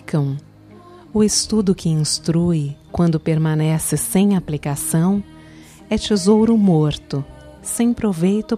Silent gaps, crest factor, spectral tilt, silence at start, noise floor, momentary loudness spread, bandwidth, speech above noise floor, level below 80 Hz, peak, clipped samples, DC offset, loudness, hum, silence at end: none; 14 dB; -5.5 dB/octave; 0.05 s; -43 dBFS; 11 LU; 15.5 kHz; 25 dB; -44 dBFS; -4 dBFS; under 0.1%; under 0.1%; -18 LUFS; none; 0 s